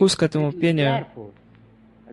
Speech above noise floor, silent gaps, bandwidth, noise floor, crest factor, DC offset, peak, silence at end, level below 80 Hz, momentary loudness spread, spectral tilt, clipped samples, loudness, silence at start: 31 dB; none; 12 kHz; -51 dBFS; 16 dB; under 0.1%; -6 dBFS; 0 s; -56 dBFS; 19 LU; -5.5 dB/octave; under 0.1%; -21 LUFS; 0 s